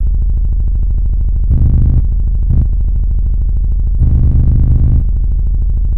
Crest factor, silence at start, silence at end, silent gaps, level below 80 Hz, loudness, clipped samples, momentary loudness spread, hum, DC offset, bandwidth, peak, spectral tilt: 10 dB; 0 s; 0 s; none; -10 dBFS; -14 LUFS; under 0.1%; 5 LU; none; 1%; 1.2 kHz; 0 dBFS; -13 dB/octave